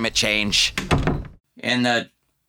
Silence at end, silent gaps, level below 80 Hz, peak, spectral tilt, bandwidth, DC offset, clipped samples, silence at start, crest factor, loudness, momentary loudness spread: 0.45 s; 1.40-1.44 s; -36 dBFS; -6 dBFS; -3 dB/octave; 20 kHz; under 0.1%; under 0.1%; 0 s; 16 dB; -20 LUFS; 12 LU